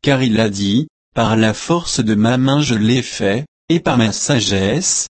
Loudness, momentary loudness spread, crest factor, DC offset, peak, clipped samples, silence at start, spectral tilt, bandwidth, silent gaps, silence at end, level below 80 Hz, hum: -16 LUFS; 5 LU; 14 dB; under 0.1%; -2 dBFS; under 0.1%; 0 s; -4.5 dB/octave; 8.8 kHz; 0.90-1.12 s, 3.48-3.68 s; 0.05 s; -44 dBFS; none